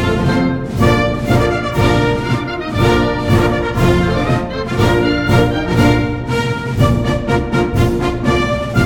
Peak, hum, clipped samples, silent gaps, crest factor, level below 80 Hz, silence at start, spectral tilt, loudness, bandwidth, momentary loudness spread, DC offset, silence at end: 0 dBFS; none; under 0.1%; none; 14 dB; -26 dBFS; 0 s; -6.5 dB/octave; -15 LUFS; 18 kHz; 5 LU; under 0.1%; 0 s